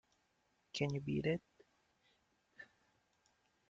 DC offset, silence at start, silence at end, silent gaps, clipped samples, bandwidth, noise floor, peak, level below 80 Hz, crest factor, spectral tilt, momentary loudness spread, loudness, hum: under 0.1%; 0.75 s; 1.05 s; none; under 0.1%; 7.8 kHz; -80 dBFS; -24 dBFS; -72 dBFS; 22 dB; -6.5 dB/octave; 21 LU; -41 LUFS; none